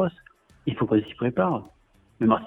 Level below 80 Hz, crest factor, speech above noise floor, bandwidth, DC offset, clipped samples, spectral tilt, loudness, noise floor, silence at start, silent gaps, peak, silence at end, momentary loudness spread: -58 dBFS; 22 dB; 32 dB; 4 kHz; under 0.1%; under 0.1%; -9.5 dB/octave; -26 LUFS; -55 dBFS; 0 s; none; -4 dBFS; 0 s; 9 LU